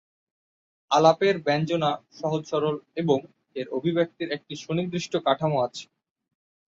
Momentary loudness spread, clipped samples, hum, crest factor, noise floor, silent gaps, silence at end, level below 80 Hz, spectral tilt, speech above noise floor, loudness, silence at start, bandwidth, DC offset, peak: 12 LU; under 0.1%; none; 22 dB; under -90 dBFS; none; 0.85 s; -68 dBFS; -6 dB/octave; over 65 dB; -25 LUFS; 0.9 s; 7.8 kHz; under 0.1%; -4 dBFS